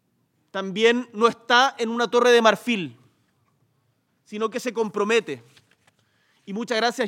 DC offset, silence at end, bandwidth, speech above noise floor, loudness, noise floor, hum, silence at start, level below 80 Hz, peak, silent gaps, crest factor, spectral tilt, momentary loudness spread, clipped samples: under 0.1%; 0 s; 15.5 kHz; 47 dB; -21 LUFS; -69 dBFS; none; 0.55 s; -84 dBFS; -2 dBFS; none; 20 dB; -3.5 dB/octave; 17 LU; under 0.1%